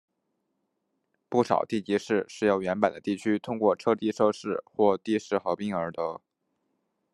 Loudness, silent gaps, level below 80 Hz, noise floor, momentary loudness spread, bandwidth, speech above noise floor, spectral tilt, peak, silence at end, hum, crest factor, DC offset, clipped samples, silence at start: -27 LUFS; none; -72 dBFS; -78 dBFS; 7 LU; 11.5 kHz; 52 dB; -6 dB/octave; -6 dBFS; 0.95 s; none; 22 dB; under 0.1%; under 0.1%; 1.3 s